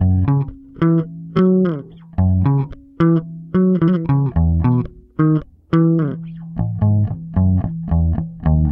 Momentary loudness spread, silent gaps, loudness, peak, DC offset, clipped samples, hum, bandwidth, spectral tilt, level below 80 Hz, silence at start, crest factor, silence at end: 9 LU; none; -18 LUFS; -4 dBFS; under 0.1%; under 0.1%; none; 3.6 kHz; -12 dB/octave; -30 dBFS; 0 s; 14 dB; 0 s